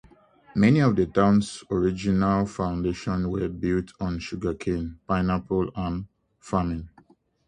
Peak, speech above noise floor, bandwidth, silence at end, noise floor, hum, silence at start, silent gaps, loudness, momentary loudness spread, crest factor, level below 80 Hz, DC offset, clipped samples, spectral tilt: -6 dBFS; 34 dB; 9.8 kHz; 0.6 s; -58 dBFS; none; 0.55 s; none; -25 LUFS; 11 LU; 20 dB; -44 dBFS; under 0.1%; under 0.1%; -7.5 dB/octave